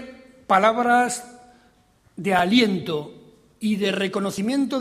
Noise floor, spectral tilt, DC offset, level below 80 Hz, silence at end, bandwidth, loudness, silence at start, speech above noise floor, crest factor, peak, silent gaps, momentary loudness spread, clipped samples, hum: -59 dBFS; -4.5 dB/octave; under 0.1%; -62 dBFS; 0 s; 14.5 kHz; -21 LUFS; 0 s; 38 dB; 20 dB; -4 dBFS; none; 12 LU; under 0.1%; none